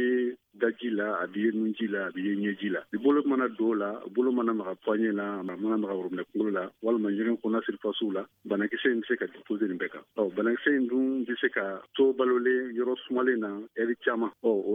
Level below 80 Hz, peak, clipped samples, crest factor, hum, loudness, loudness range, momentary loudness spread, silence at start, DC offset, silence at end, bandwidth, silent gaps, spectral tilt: -84 dBFS; -12 dBFS; under 0.1%; 18 dB; none; -29 LUFS; 3 LU; 7 LU; 0 s; under 0.1%; 0 s; 3.8 kHz; none; -8 dB/octave